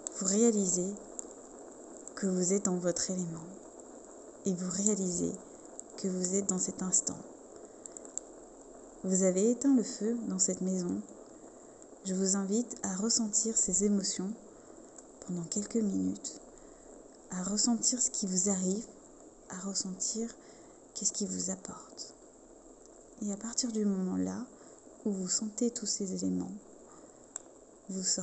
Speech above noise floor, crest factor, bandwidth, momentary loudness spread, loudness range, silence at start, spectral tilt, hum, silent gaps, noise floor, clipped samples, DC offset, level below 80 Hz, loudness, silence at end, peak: 24 dB; 26 dB; 8.8 kHz; 23 LU; 5 LU; 0 s; -4 dB/octave; none; none; -56 dBFS; under 0.1%; under 0.1%; -68 dBFS; -32 LUFS; 0 s; -8 dBFS